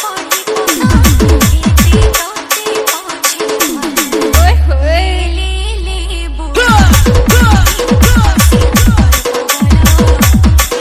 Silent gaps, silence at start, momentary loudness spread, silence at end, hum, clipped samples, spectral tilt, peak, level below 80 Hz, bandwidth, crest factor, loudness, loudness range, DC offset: none; 0 s; 8 LU; 0 s; none; 1%; -4.5 dB/octave; 0 dBFS; -12 dBFS; 16.5 kHz; 8 dB; -10 LUFS; 4 LU; under 0.1%